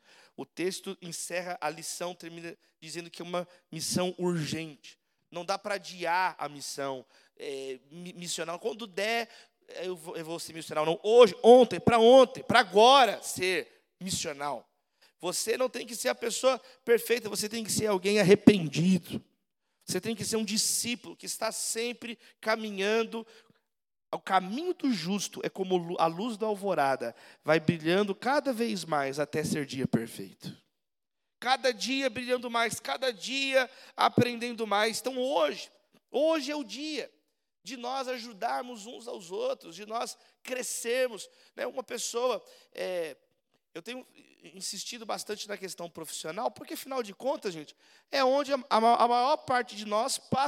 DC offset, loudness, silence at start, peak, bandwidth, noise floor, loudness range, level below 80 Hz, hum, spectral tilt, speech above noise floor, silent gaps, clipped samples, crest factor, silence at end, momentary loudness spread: under 0.1%; -29 LUFS; 0.4 s; -2 dBFS; 16.5 kHz; -90 dBFS; 13 LU; -74 dBFS; none; -4 dB/octave; 61 dB; none; under 0.1%; 26 dB; 0 s; 18 LU